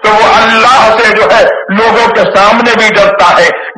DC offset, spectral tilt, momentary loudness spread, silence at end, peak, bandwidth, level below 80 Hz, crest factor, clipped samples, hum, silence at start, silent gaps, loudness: under 0.1%; -3.5 dB/octave; 3 LU; 0.05 s; 0 dBFS; 11 kHz; -38 dBFS; 6 dB; 5%; none; 0 s; none; -5 LUFS